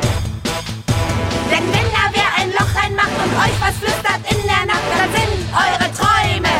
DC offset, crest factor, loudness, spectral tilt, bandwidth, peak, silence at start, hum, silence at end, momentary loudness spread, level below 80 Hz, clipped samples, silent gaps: under 0.1%; 14 dB; -16 LUFS; -4 dB/octave; 16.5 kHz; -2 dBFS; 0 s; none; 0 s; 5 LU; -30 dBFS; under 0.1%; none